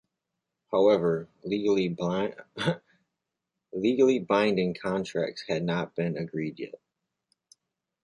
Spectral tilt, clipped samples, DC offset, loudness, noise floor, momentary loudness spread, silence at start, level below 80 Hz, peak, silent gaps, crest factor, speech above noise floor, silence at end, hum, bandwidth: -6.5 dB/octave; under 0.1%; under 0.1%; -27 LUFS; -85 dBFS; 11 LU; 0.7 s; -66 dBFS; -10 dBFS; none; 18 dB; 58 dB; 1.3 s; none; 11 kHz